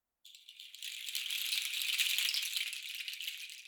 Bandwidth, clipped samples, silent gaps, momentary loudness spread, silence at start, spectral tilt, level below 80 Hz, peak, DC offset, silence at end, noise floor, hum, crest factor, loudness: over 20 kHz; under 0.1%; none; 19 LU; 0.25 s; 9 dB/octave; under -90 dBFS; -14 dBFS; under 0.1%; 0 s; -59 dBFS; none; 24 dB; -35 LUFS